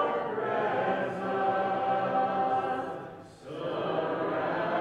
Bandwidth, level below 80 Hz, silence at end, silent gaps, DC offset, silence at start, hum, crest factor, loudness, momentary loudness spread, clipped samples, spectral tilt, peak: 9.2 kHz; -68 dBFS; 0 s; none; under 0.1%; 0 s; none; 14 dB; -30 LUFS; 10 LU; under 0.1%; -7 dB/octave; -16 dBFS